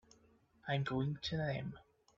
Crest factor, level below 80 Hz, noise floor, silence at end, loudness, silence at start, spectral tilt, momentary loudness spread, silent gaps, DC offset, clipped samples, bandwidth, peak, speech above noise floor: 18 dB; -64 dBFS; -70 dBFS; 0.35 s; -39 LUFS; 0.65 s; -5 dB/octave; 13 LU; none; under 0.1%; under 0.1%; 7.6 kHz; -24 dBFS; 31 dB